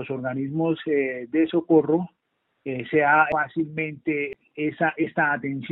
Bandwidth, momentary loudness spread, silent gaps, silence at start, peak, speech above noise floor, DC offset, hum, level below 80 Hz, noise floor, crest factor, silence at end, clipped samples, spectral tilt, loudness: 4.1 kHz; 11 LU; none; 0 s; -4 dBFS; 51 dB; under 0.1%; none; -64 dBFS; -74 dBFS; 18 dB; 0 s; under 0.1%; -5.5 dB/octave; -24 LUFS